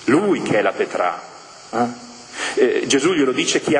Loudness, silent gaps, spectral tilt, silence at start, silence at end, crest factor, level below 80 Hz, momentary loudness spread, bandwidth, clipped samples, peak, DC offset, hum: -19 LUFS; none; -3.5 dB/octave; 0 s; 0 s; 16 dB; -62 dBFS; 17 LU; 10 kHz; under 0.1%; -2 dBFS; under 0.1%; none